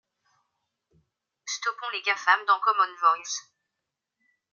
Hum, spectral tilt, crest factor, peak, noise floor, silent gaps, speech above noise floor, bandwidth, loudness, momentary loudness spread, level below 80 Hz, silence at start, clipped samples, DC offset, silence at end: none; 2.5 dB/octave; 22 dB; -6 dBFS; -85 dBFS; none; 60 dB; 7.4 kHz; -25 LUFS; 13 LU; -88 dBFS; 1.45 s; under 0.1%; under 0.1%; 1.1 s